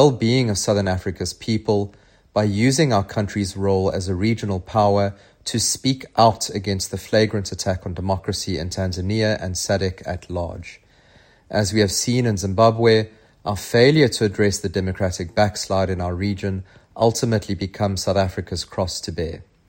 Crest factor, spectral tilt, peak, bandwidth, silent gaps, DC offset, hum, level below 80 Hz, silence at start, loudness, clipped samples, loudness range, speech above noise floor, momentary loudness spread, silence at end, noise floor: 20 dB; -5 dB/octave; -2 dBFS; 16.5 kHz; none; under 0.1%; none; -48 dBFS; 0 s; -21 LUFS; under 0.1%; 5 LU; 32 dB; 11 LU; 0.25 s; -53 dBFS